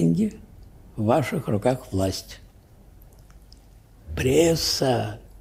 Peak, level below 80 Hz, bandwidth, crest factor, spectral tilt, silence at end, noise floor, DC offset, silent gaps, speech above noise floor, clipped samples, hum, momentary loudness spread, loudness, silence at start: -6 dBFS; -46 dBFS; 16 kHz; 20 dB; -5.5 dB/octave; 0.15 s; -50 dBFS; under 0.1%; none; 27 dB; under 0.1%; none; 16 LU; -23 LUFS; 0 s